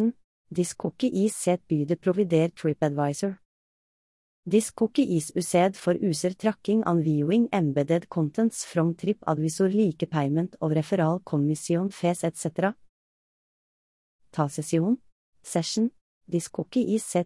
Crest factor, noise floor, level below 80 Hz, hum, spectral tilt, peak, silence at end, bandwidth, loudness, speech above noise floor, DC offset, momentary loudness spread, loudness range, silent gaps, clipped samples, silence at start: 16 dB; under -90 dBFS; -68 dBFS; none; -6 dB/octave; -10 dBFS; 0 s; 12 kHz; -26 LUFS; over 65 dB; under 0.1%; 6 LU; 5 LU; 0.24-0.45 s, 3.45-4.43 s, 12.89-14.19 s, 15.12-15.33 s, 16.01-16.21 s; under 0.1%; 0 s